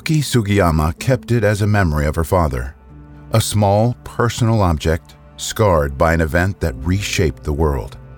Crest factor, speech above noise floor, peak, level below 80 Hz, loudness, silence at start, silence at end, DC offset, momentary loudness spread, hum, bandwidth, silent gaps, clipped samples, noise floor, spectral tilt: 14 dB; 23 dB; -2 dBFS; -28 dBFS; -17 LUFS; 0.05 s; 0 s; under 0.1%; 6 LU; none; over 20 kHz; none; under 0.1%; -39 dBFS; -6 dB/octave